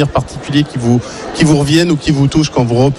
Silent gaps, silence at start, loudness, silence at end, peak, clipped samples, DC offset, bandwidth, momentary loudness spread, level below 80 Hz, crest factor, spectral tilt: none; 0 s; -13 LUFS; 0 s; 0 dBFS; under 0.1%; under 0.1%; 12.5 kHz; 5 LU; -34 dBFS; 12 dB; -6 dB/octave